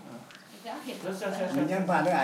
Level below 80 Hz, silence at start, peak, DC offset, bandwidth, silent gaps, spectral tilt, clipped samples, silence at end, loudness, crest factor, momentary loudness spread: -82 dBFS; 0 s; -12 dBFS; under 0.1%; 16 kHz; none; -6 dB/octave; under 0.1%; 0 s; -31 LUFS; 18 dB; 20 LU